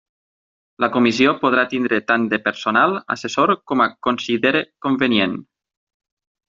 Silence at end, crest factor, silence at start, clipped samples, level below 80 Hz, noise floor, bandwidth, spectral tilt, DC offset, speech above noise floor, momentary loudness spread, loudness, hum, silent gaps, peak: 1.05 s; 18 dB; 0.8 s; under 0.1%; -62 dBFS; under -90 dBFS; 7.6 kHz; -2.5 dB/octave; under 0.1%; over 72 dB; 7 LU; -18 LUFS; none; none; -2 dBFS